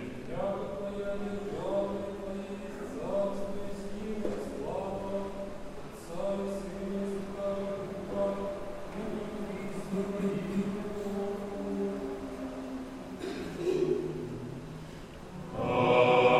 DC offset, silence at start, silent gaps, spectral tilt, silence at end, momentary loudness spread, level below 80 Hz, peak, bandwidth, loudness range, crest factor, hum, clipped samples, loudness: under 0.1%; 0 s; none; -6.5 dB/octave; 0 s; 10 LU; -52 dBFS; -10 dBFS; 14.5 kHz; 2 LU; 22 dB; none; under 0.1%; -34 LUFS